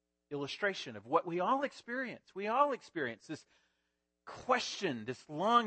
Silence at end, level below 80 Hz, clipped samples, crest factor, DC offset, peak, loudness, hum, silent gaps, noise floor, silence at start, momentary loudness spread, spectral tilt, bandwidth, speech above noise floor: 0 s; -78 dBFS; under 0.1%; 22 dB; under 0.1%; -14 dBFS; -36 LUFS; none; none; -84 dBFS; 0.3 s; 14 LU; -4 dB/octave; 8.4 kHz; 49 dB